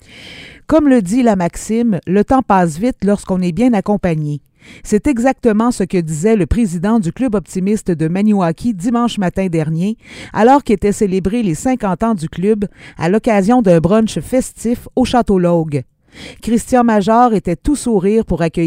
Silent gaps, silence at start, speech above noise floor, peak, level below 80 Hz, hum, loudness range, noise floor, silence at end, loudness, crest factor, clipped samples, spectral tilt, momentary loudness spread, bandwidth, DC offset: none; 0.15 s; 22 dB; 0 dBFS; -34 dBFS; none; 2 LU; -36 dBFS; 0 s; -14 LUFS; 14 dB; under 0.1%; -6.5 dB/octave; 9 LU; 15.5 kHz; under 0.1%